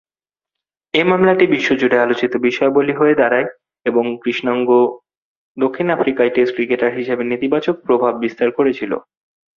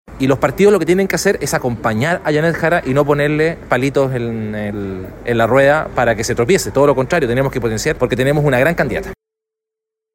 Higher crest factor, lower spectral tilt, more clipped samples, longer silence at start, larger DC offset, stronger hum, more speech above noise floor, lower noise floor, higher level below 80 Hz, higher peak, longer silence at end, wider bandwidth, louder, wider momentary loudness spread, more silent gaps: about the same, 16 dB vs 14 dB; about the same, -6.5 dB/octave vs -5.5 dB/octave; neither; first, 0.95 s vs 0.1 s; neither; neither; first, over 74 dB vs 68 dB; first, under -90 dBFS vs -83 dBFS; second, -60 dBFS vs -38 dBFS; about the same, 0 dBFS vs 0 dBFS; second, 0.55 s vs 1 s; second, 7 kHz vs 16.5 kHz; about the same, -16 LUFS vs -15 LUFS; second, 7 LU vs 10 LU; first, 5.17-5.55 s vs none